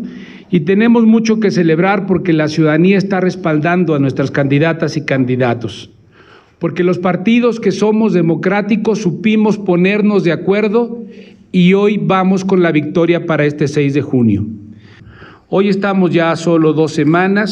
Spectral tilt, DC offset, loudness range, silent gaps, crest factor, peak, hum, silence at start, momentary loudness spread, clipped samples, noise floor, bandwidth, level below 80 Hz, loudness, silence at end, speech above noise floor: -7.5 dB/octave; under 0.1%; 3 LU; none; 10 dB; -2 dBFS; none; 0 s; 6 LU; under 0.1%; -44 dBFS; 8.6 kHz; -56 dBFS; -13 LUFS; 0 s; 32 dB